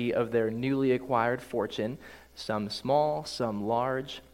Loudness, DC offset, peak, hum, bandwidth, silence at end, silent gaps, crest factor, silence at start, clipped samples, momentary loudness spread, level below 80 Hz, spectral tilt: -30 LUFS; under 0.1%; -12 dBFS; none; 16 kHz; 0.1 s; none; 18 dB; 0 s; under 0.1%; 8 LU; -62 dBFS; -6 dB/octave